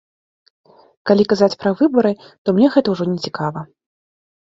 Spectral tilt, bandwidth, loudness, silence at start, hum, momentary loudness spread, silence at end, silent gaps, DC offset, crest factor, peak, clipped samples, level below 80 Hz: -7 dB/octave; 7.6 kHz; -17 LUFS; 1.05 s; none; 10 LU; 0.85 s; 2.38-2.45 s; under 0.1%; 18 dB; 0 dBFS; under 0.1%; -60 dBFS